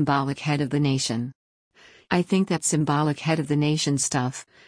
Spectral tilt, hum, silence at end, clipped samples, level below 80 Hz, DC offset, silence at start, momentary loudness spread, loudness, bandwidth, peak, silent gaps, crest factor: -5 dB/octave; none; 0.25 s; under 0.1%; -60 dBFS; under 0.1%; 0 s; 5 LU; -24 LUFS; 10.5 kHz; -8 dBFS; 1.35-1.71 s; 16 dB